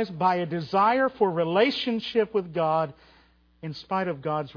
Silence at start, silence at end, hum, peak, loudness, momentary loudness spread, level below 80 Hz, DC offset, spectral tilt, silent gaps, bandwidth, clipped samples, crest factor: 0 s; 0.05 s; none; -8 dBFS; -25 LUFS; 9 LU; -64 dBFS; under 0.1%; -7 dB/octave; none; 5.4 kHz; under 0.1%; 18 dB